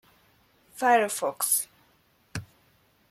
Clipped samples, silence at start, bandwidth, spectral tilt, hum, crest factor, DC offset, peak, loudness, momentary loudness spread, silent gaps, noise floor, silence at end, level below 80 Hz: under 0.1%; 0.75 s; 16 kHz; -2 dB/octave; none; 22 dB; under 0.1%; -8 dBFS; -25 LUFS; 18 LU; none; -65 dBFS; 0.65 s; -66 dBFS